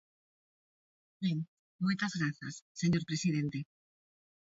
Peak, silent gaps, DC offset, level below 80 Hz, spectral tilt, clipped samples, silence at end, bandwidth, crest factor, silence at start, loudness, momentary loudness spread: -20 dBFS; 1.48-1.79 s, 2.62-2.75 s; under 0.1%; -70 dBFS; -5.5 dB/octave; under 0.1%; 0.9 s; 8 kHz; 18 dB; 1.2 s; -35 LUFS; 12 LU